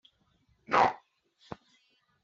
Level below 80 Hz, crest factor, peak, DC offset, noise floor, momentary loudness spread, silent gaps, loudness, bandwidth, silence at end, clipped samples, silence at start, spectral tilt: -68 dBFS; 24 dB; -10 dBFS; under 0.1%; -71 dBFS; 23 LU; none; -27 LUFS; 7.6 kHz; 1.3 s; under 0.1%; 0.7 s; -2 dB/octave